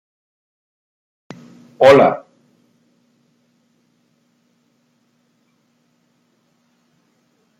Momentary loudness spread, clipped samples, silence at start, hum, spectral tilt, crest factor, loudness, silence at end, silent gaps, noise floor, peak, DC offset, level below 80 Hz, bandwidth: 31 LU; under 0.1%; 1.8 s; none; -6 dB/octave; 22 dB; -12 LUFS; 5.4 s; none; -63 dBFS; 0 dBFS; under 0.1%; -62 dBFS; 11.5 kHz